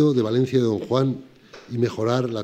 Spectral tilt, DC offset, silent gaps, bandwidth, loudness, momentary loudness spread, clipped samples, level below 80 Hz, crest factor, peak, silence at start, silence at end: -7.5 dB/octave; under 0.1%; none; 9 kHz; -22 LUFS; 7 LU; under 0.1%; -66 dBFS; 16 dB; -6 dBFS; 0 s; 0 s